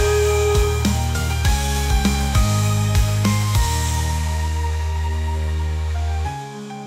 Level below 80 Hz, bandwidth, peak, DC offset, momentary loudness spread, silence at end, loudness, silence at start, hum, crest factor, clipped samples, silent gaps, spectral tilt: -24 dBFS; 16 kHz; -6 dBFS; under 0.1%; 6 LU; 0 s; -20 LUFS; 0 s; none; 14 dB; under 0.1%; none; -5 dB/octave